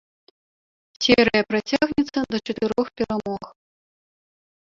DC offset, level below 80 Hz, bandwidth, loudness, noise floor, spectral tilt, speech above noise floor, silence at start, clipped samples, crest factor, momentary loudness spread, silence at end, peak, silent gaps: under 0.1%; -52 dBFS; 7.6 kHz; -22 LUFS; under -90 dBFS; -4.5 dB/octave; over 68 dB; 1 s; under 0.1%; 22 dB; 10 LU; 1.2 s; -2 dBFS; none